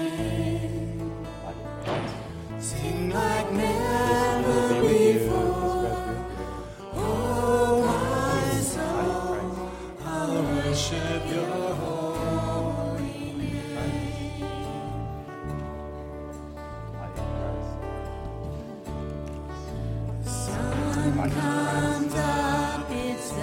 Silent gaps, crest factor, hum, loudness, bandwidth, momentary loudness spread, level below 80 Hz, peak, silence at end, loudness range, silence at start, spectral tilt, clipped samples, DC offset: none; 18 dB; none; -28 LUFS; 16.5 kHz; 13 LU; -40 dBFS; -10 dBFS; 0 s; 11 LU; 0 s; -5.5 dB/octave; under 0.1%; under 0.1%